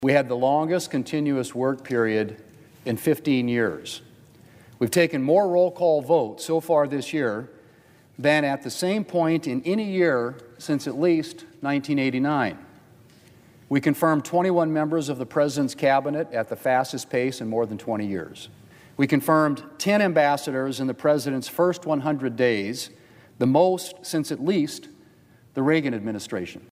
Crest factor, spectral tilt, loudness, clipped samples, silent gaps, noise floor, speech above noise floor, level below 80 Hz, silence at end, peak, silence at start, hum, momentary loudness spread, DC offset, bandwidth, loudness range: 18 dB; -5.5 dB/octave; -24 LUFS; under 0.1%; none; -54 dBFS; 31 dB; -68 dBFS; 0.1 s; -6 dBFS; 0 s; none; 10 LU; under 0.1%; 16 kHz; 3 LU